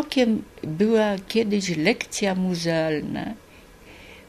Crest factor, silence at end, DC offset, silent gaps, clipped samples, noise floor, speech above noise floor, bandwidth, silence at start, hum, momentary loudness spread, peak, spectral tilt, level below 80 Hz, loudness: 18 dB; 0.1 s; under 0.1%; none; under 0.1%; -47 dBFS; 25 dB; 14 kHz; 0 s; none; 12 LU; -6 dBFS; -5 dB/octave; -54 dBFS; -23 LUFS